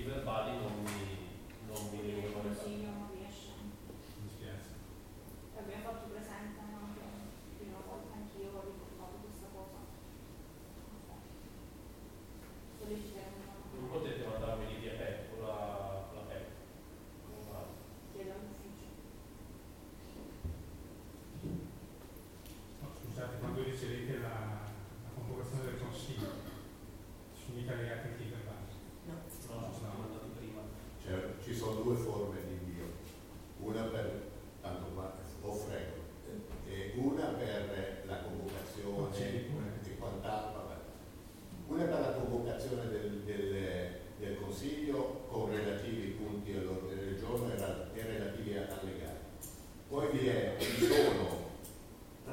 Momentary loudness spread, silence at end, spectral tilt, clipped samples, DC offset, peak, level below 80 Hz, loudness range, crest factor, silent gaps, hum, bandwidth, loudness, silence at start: 15 LU; 0 s; -6 dB/octave; under 0.1%; under 0.1%; -16 dBFS; -56 dBFS; 11 LU; 24 dB; none; none; 17 kHz; -41 LUFS; 0 s